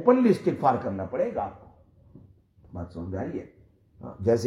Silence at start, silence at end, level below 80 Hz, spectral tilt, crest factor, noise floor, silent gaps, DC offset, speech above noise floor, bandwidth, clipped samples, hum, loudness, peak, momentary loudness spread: 0 s; 0 s; -60 dBFS; -8 dB/octave; 20 dB; -55 dBFS; none; under 0.1%; 30 dB; 12 kHz; under 0.1%; none; -27 LUFS; -6 dBFS; 19 LU